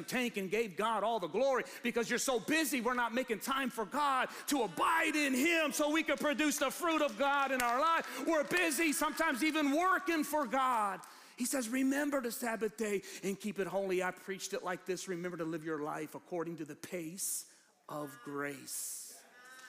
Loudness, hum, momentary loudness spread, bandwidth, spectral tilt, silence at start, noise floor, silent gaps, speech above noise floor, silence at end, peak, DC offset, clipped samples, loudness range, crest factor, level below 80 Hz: -34 LUFS; none; 10 LU; 15.5 kHz; -3 dB/octave; 0 s; -56 dBFS; none; 21 dB; 0 s; -16 dBFS; under 0.1%; under 0.1%; 9 LU; 20 dB; -70 dBFS